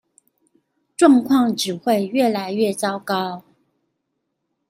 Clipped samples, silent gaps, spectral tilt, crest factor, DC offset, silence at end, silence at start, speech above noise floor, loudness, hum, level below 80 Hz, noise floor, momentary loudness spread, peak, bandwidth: under 0.1%; none; -4.5 dB/octave; 18 dB; under 0.1%; 1.3 s; 1 s; 57 dB; -19 LUFS; none; -66 dBFS; -75 dBFS; 11 LU; -2 dBFS; 16 kHz